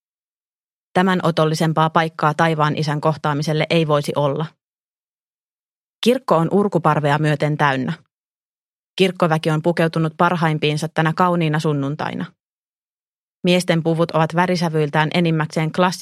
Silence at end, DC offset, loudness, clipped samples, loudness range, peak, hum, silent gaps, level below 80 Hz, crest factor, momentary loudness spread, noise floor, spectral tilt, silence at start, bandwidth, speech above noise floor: 0 s; under 0.1%; -18 LUFS; under 0.1%; 3 LU; 0 dBFS; none; 4.64-6.02 s, 8.13-8.97 s, 12.43-13.41 s; -62 dBFS; 18 dB; 6 LU; under -90 dBFS; -6.5 dB/octave; 0.95 s; 13.5 kHz; over 72 dB